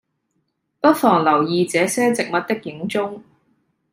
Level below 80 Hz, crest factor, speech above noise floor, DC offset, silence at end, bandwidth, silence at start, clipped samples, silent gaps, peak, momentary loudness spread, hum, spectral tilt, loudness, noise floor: -66 dBFS; 18 dB; 53 dB; under 0.1%; 0.75 s; 16 kHz; 0.85 s; under 0.1%; none; -2 dBFS; 10 LU; none; -4.5 dB/octave; -19 LUFS; -71 dBFS